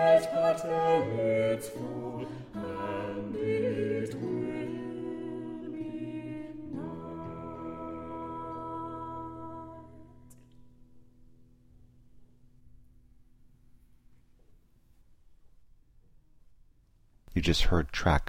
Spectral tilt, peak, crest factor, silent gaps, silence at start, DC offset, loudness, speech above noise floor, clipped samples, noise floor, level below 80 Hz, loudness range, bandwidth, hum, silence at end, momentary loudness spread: -6 dB/octave; -12 dBFS; 22 dB; none; 0 s; under 0.1%; -33 LUFS; 35 dB; under 0.1%; -63 dBFS; -44 dBFS; 14 LU; 16 kHz; none; 0 s; 14 LU